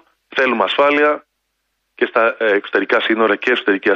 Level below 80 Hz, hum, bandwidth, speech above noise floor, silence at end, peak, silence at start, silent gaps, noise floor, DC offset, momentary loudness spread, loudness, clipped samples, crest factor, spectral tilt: -68 dBFS; none; 7.2 kHz; 56 dB; 0 s; -2 dBFS; 0.3 s; none; -71 dBFS; under 0.1%; 5 LU; -16 LUFS; under 0.1%; 16 dB; -5 dB/octave